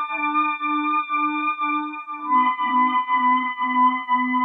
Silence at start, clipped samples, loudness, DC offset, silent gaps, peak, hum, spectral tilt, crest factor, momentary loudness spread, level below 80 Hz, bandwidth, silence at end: 0 s; under 0.1%; -21 LUFS; under 0.1%; none; -8 dBFS; none; -5 dB/octave; 12 dB; 4 LU; -86 dBFS; 3.9 kHz; 0 s